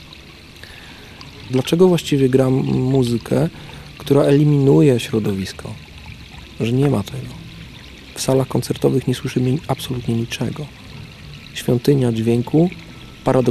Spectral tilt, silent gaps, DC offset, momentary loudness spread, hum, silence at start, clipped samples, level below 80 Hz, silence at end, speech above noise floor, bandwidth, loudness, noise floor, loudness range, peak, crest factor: -7 dB/octave; none; under 0.1%; 23 LU; none; 0 s; under 0.1%; -44 dBFS; 0 s; 23 dB; 14 kHz; -18 LUFS; -40 dBFS; 6 LU; -2 dBFS; 16 dB